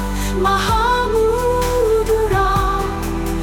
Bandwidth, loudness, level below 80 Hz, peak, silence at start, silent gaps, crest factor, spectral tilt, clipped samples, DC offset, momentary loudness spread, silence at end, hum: 19 kHz; -17 LUFS; -24 dBFS; -4 dBFS; 0 s; none; 12 dB; -5 dB/octave; under 0.1%; under 0.1%; 6 LU; 0 s; none